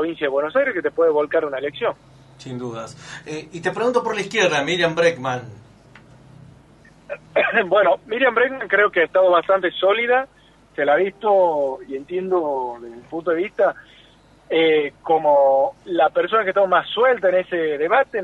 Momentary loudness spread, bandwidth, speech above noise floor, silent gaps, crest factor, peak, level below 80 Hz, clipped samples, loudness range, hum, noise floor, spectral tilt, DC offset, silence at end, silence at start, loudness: 15 LU; 10.5 kHz; 32 dB; none; 16 dB; -4 dBFS; -60 dBFS; under 0.1%; 5 LU; none; -51 dBFS; -4.5 dB/octave; under 0.1%; 0 s; 0 s; -19 LUFS